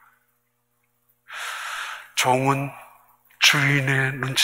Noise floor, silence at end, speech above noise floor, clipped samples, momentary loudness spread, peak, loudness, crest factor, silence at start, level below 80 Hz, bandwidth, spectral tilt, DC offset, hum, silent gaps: -71 dBFS; 0 s; 50 dB; under 0.1%; 16 LU; -2 dBFS; -21 LUFS; 24 dB; 1.3 s; -66 dBFS; 16 kHz; -3 dB/octave; under 0.1%; 60 Hz at -60 dBFS; none